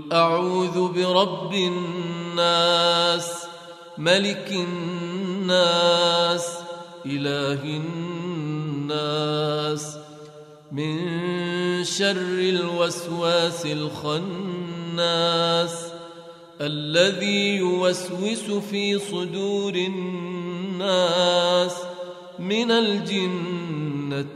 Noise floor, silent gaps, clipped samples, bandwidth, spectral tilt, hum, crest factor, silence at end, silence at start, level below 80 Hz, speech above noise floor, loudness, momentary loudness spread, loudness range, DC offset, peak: -44 dBFS; none; under 0.1%; 13.5 kHz; -4.5 dB/octave; none; 20 dB; 0 s; 0 s; -70 dBFS; 21 dB; -23 LUFS; 12 LU; 5 LU; under 0.1%; -4 dBFS